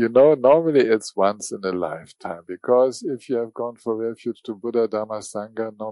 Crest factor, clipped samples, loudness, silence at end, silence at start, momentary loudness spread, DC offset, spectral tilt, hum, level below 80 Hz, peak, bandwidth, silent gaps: 18 dB; under 0.1%; -22 LUFS; 0 s; 0 s; 15 LU; under 0.1%; -5.5 dB/octave; none; -70 dBFS; -4 dBFS; 11.5 kHz; none